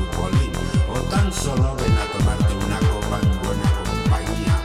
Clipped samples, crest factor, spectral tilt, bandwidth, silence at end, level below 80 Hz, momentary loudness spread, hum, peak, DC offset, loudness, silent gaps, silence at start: under 0.1%; 14 dB; -6 dB/octave; 15.5 kHz; 0 s; -24 dBFS; 2 LU; none; -6 dBFS; under 0.1%; -21 LUFS; none; 0 s